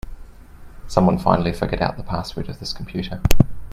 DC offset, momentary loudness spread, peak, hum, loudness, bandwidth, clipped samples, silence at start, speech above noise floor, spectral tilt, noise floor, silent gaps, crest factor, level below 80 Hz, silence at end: under 0.1%; 12 LU; 0 dBFS; none; -22 LUFS; 16 kHz; under 0.1%; 0.05 s; 22 dB; -6.5 dB/octave; -40 dBFS; none; 20 dB; -30 dBFS; 0 s